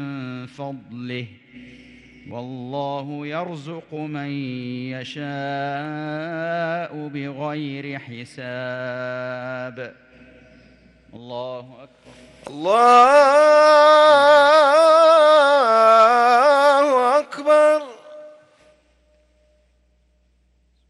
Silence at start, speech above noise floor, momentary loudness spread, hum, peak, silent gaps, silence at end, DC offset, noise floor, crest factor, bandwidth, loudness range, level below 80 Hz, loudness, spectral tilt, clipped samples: 0 s; 44 dB; 22 LU; none; -4 dBFS; none; 2.6 s; under 0.1%; -62 dBFS; 16 dB; 12 kHz; 19 LU; -64 dBFS; -16 LUFS; -4.5 dB/octave; under 0.1%